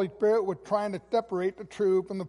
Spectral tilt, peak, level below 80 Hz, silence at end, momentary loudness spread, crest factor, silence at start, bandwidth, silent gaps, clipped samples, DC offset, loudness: -7 dB/octave; -14 dBFS; -66 dBFS; 0 s; 6 LU; 14 dB; 0 s; 11.5 kHz; none; under 0.1%; under 0.1%; -28 LUFS